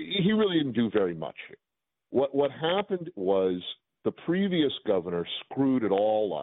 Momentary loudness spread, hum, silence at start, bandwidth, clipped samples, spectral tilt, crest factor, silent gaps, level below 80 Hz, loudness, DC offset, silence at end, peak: 10 LU; none; 0 s; 4.1 kHz; under 0.1%; -4.5 dB/octave; 16 dB; none; -66 dBFS; -28 LUFS; under 0.1%; 0 s; -12 dBFS